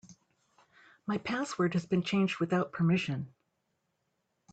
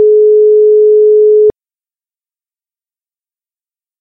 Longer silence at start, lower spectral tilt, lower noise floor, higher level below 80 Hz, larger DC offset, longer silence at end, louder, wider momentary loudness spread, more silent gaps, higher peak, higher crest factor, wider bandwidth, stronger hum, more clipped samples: about the same, 0.1 s vs 0 s; second, -6.5 dB/octave vs -12 dB/octave; second, -80 dBFS vs under -90 dBFS; second, -70 dBFS vs -56 dBFS; neither; second, 1.25 s vs 2.5 s; second, -31 LUFS vs -7 LUFS; first, 9 LU vs 2 LU; neither; second, -18 dBFS vs -2 dBFS; first, 16 dB vs 8 dB; first, 8.8 kHz vs 0.9 kHz; neither; neither